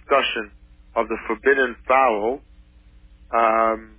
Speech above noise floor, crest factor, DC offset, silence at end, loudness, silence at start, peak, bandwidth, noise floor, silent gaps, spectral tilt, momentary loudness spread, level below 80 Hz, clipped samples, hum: 29 dB; 18 dB; under 0.1%; 0.15 s; -21 LUFS; 0.1 s; -4 dBFS; 4 kHz; -49 dBFS; none; -7 dB/octave; 11 LU; -48 dBFS; under 0.1%; none